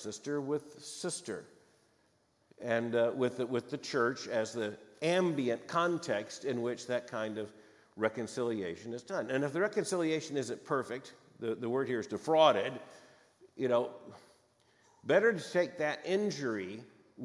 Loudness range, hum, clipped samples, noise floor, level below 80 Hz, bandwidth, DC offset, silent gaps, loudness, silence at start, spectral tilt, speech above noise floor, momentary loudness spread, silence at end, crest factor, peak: 4 LU; none; under 0.1%; -72 dBFS; -84 dBFS; 12 kHz; under 0.1%; none; -34 LUFS; 0 s; -4.5 dB/octave; 39 dB; 13 LU; 0 s; 22 dB; -12 dBFS